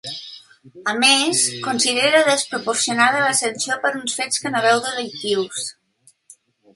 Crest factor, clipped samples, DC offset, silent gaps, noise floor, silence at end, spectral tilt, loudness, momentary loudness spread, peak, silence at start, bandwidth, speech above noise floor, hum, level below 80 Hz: 20 dB; under 0.1%; under 0.1%; none; -58 dBFS; 1.05 s; -1 dB/octave; -18 LUFS; 12 LU; 0 dBFS; 0.05 s; 12 kHz; 38 dB; none; -70 dBFS